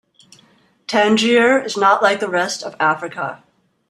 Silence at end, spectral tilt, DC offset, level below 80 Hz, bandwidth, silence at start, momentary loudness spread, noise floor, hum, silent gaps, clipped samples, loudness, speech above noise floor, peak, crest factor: 0.55 s; -3.5 dB/octave; under 0.1%; -66 dBFS; 13 kHz; 0.9 s; 13 LU; -54 dBFS; none; none; under 0.1%; -16 LUFS; 38 dB; 0 dBFS; 18 dB